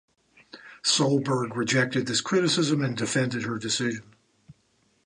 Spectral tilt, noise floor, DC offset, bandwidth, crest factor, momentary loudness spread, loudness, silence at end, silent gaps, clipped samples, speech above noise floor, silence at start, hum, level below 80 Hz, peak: -4 dB/octave; -67 dBFS; under 0.1%; 11 kHz; 16 dB; 7 LU; -25 LUFS; 0.55 s; none; under 0.1%; 42 dB; 0.55 s; none; -68 dBFS; -10 dBFS